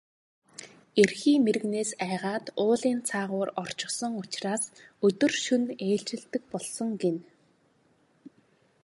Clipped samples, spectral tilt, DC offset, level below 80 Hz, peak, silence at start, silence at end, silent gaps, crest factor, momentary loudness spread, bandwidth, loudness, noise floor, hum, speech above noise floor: under 0.1%; -4 dB/octave; under 0.1%; -74 dBFS; -6 dBFS; 0.6 s; 0.55 s; none; 22 dB; 11 LU; 11.5 kHz; -28 LUFS; -66 dBFS; none; 39 dB